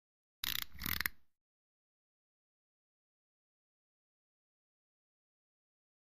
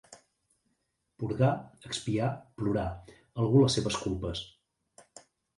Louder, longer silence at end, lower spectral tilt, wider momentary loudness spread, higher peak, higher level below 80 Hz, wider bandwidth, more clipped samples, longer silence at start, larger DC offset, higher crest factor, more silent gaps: second, -39 LUFS vs -30 LUFS; first, 4.7 s vs 1.1 s; second, -1 dB/octave vs -6 dB/octave; second, 4 LU vs 15 LU; second, -16 dBFS vs -12 dBFS; second, -64 dBFS vs -52 dBFS; first, 15.5 kHz vs 11.5 kHz; neither; first, 0.4 s vs 0.1 s; neither; first, 34 dB vs 20 dB; neither